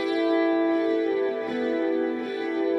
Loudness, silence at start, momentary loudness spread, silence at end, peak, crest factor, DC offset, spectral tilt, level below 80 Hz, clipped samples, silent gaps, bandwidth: -25 LUFS; 0 s; 5 LU; 0 s; -14 dBFS; 12 dB; under 0.1%; -5.5 dB/octave; -72 dBFS; under 0.1%; none; 6 kHz